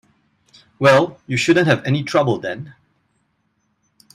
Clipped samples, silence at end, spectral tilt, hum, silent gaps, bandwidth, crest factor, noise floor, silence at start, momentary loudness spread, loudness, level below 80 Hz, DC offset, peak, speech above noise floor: under 0.1%; 1.45 s; -5.5 dB/octave; none; none; 13 kHz; 20 dB; -67 dBFS; 0.8 s; 14 LU; -17 LUFS; -58 dBFS; under 0.1%; 0 dBFS; 51 dB